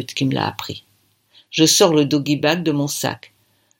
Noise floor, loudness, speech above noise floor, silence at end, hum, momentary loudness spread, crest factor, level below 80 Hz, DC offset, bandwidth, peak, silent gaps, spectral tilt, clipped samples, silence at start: -58 dBFS; -17 LUFS; 40 dB; 0.65 s; none; 18 LU; 20 dB; -62 dBFS; under 0.1%; 17 kHz; 0 dBFS; none; -4 dB/octave; under 0.1%; 0 s